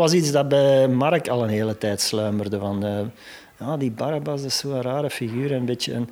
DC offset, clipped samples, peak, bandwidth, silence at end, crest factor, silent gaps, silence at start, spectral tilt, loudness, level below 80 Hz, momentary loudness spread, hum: under 0.1%; under 0.1%; -6 dBFS; 17 kHz; 0 s; 16 dB; none; 0 s; -5 dB/octave; -22 LUFS; -64 dBFS; 10 LU; none